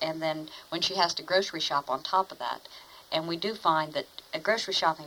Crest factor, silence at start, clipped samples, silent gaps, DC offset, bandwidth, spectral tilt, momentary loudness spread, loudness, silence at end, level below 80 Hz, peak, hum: 20 dB; 0 s; under 0.1%; none; under 0.1%; over 20 kHz; -3 dB/octave; 11 LU; -29 LUFS; 0 s; -70 dBFS; -10 dBFS; none